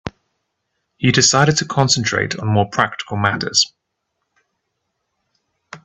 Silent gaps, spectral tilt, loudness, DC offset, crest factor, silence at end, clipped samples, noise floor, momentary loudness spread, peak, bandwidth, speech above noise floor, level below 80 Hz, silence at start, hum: none; -3.5 dB/octave; -16 LUFS; under 0.1%; 20 dB; 0.1 s; under 0.1%; -75 dBFS; 8 LU; 0 dBFS; 8.6 kHz; 58 dB; -52 dBFS; 0.05 s; none